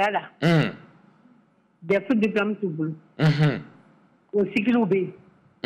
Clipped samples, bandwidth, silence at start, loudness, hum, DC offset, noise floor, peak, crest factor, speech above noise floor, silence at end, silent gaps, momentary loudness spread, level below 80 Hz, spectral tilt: under 0.1%; 9.6 kHz; 0 s; -24 LUFS; none; under 0.1%; -61 dBFS; -12 dBFS; 14 dB; 38 dB; 0.55 s; none; 9 LU; -62 dBFS; -8 dB/octave